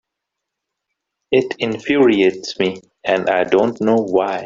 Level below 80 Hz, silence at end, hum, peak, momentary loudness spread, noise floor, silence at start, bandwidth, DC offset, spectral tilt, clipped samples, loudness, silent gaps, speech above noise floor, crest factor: -58 dBFS; 0 s; none; -2 dBFS; 8 LU; -80 dBFS; 1.3 s; 7.6 kHz; under 0.1%; -5.5 dB/octave; under 0.1%; -17 LUFS; none; 64 dB; 16 dB